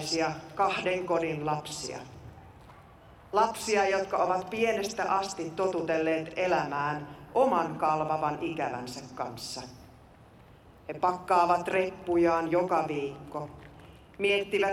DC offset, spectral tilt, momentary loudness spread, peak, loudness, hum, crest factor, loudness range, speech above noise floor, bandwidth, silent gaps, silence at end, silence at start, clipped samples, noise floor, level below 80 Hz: under 0.1%; -4.5 dB/octave; 14 LU; -12 dBFS; -29 LUFS; none; 18 dB; 4 LU; 25 dB; 16 kHz; none; 0 s; 0 s; under 0.1%; -54 dBFS; -62 dBFS